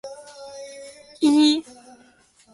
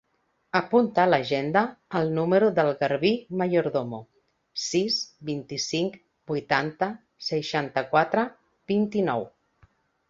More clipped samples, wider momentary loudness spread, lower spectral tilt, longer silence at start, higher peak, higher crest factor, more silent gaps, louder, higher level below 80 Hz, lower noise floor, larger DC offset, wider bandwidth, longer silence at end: neither; first, 24 LU vs 11 LU; second, -2.5 dB/octave vs -5 dB/octave; second, 0.05 s vs 0.55 s; second, -8 dBFS vs -4 dBFS; about the same, 18 dB vs 22 dB; neither; first, -19 LUFS vs -25 LUFS; about the same, -70 dBFS vs -66 dBFS; second, -56 dBFS vs -72 dBFS; neither; first, 11.5 kHz vs 7.8 kHz; first, 0.95 s vs 0.8 s